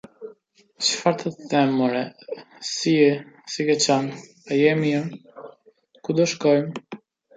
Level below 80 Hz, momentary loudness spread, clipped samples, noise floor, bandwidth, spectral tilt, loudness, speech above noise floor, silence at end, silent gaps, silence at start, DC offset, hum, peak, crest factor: -72 dBFS; 22 LU; under 0.1%; -58 dBFS; 9.4 kHz; -4.5 dB/octave; -22 LUFS; 36 dB; 0.4 s; none; 0.2 s; under 0.1%; none; -4 dBFS; 20 dB